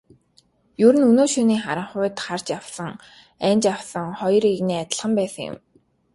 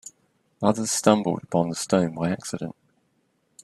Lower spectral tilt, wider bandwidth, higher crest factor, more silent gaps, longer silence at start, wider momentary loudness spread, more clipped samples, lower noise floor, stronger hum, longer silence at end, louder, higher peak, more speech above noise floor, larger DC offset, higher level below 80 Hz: about the same, -5 dB/octave vs -5 dB/octave; second, 11.5 kHz vs 13 kHz; second, 18 dB vs 24 dB; neither; first, 0.8 s vs 0.05 s; first, 16 LU vs 13 LU; neither; second, -60 dBFS vs -69 dBFS; neither; second, 0.6 s vs 0.9 s; first, -21 LUFS vs -24 LUFS; about the same, -2 dBFS vs -2 dBFS; second, 40 dB vs 46 dB; neither; about the same, -62 dBFS vs -64 dBFS